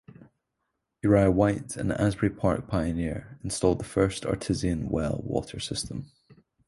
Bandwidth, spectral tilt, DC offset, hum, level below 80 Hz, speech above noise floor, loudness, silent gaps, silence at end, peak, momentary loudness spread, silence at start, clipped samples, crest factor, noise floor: 11.5 kHz; -6 dB/octave; under 0.1%; none; -44 dBFS; 54 dB; -27 LUFS; none; 0.35 s; -6 dBFS; 10 LU; 0.2 s; under 0.1%; 22 dB; -81 dBFS